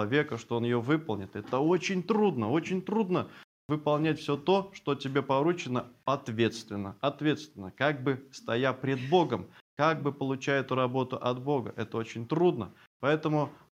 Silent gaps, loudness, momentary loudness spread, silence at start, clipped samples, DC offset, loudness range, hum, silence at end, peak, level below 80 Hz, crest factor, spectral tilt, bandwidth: 3.44-3.69 s, 9.61-9.77 s, 12.87-13.00 s; -30 LUFS; 8 LU; 0 s; under 0.1%; under 0.1%; 2 LU; none; 0.2 s; -12 dBFS; -74 dBFS; 18 dB; -6.5 dB/octave; 10.5 kHz